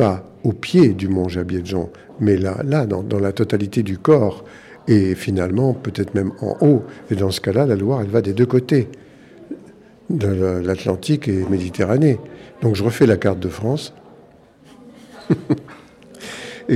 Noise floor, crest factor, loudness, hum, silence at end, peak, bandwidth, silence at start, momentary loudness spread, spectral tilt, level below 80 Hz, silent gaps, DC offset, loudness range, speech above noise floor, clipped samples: -48 dBFS; 16 dB; -19 LUFS; none; 0 s; -2 dBFS; 14 kHz; 0 s; 15 LU; -7.5 dB/octave; -50 dBFS; none; under 0.1%; 3 LU; 30 dB; under 0.1%